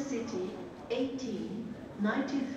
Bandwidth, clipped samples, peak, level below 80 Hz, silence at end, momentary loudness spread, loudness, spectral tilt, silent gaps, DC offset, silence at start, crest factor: 8.8 kHz; under 0.1%; -18 dBFS; -66 dBFS; 0 s; 9 LU; -36 LUFS; -5.5 dB/octave; none; under 0.1%; 0 s; 16 dB